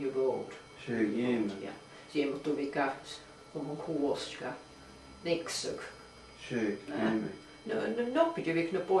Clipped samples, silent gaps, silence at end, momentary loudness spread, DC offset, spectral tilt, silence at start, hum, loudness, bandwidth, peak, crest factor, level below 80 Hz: under 0.1%; none; 0 s; 17 LU; under 0.1%; -5 dB/octave; 0 s; none; -34 LUFS; 12.5 kHz; -14 dBFS; 20 dB; -66 dBFS